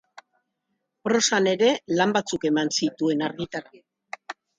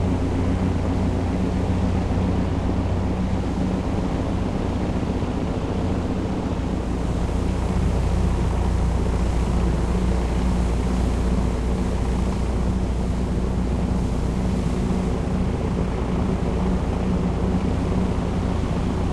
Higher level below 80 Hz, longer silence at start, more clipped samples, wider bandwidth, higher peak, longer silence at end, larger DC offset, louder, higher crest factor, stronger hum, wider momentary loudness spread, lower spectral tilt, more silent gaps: second, -68 dBFS vs -26 dBFS; first, 0.15 s vs 0 s; neither; second, 9.6 kHz vs 11.5 kHz; first, -6 dBFS vs -10 dBFS; first, 0.25 s vs 0 s; neither; about the same, -23 LUFS vs -24 LUFS; first, 18 dB vs 12 dB; neither; first, 17 LU vs 2 LU; second, -3.5 dB/octave vs -7.5 dB/octave; neither